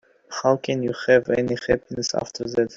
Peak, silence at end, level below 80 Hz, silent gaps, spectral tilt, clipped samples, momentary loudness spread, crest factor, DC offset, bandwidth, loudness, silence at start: -4 dBFS; 0 s; -54 dBFS; none; -4.5 dB/octave; under 0.1%; 8 LU; 18 dB; under 0.1%; 7.8 kHz; -22 LUFS; 0.3 s